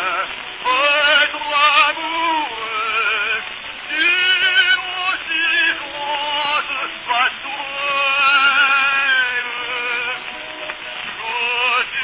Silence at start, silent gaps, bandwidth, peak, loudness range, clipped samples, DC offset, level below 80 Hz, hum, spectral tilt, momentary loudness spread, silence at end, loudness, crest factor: 0 s; none; 4 kHz; -2 dBFS; 3 LU; under 0.1%; under 0.1%; -58 dBFS; none; -4 dB/octave; 13 LU; 0 s; -16 LUFS; 16 dB